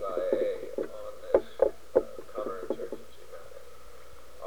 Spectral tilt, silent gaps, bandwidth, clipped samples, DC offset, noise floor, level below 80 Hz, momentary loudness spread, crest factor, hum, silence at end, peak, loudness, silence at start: -5.5 dB/octave; none; 20 kHz; under 0.1%; 0.9%; -52 dBFS; -58 dBFS; 23 LU; 24 dB; none; 0 s; -8 dBFS; -32 LUFS; 0 s